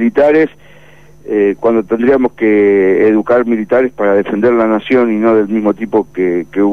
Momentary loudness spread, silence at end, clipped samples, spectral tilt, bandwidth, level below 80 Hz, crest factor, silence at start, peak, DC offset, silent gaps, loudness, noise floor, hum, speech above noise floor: 5 LU; 0 s; under 0.1%; -8 dB/octave; 6.4 kHz; -48 dBFS; 10 dB; 0 s; -2 dBFS; 0.8%; none; -12 LUFS; -42 dBFS; none; 31 dB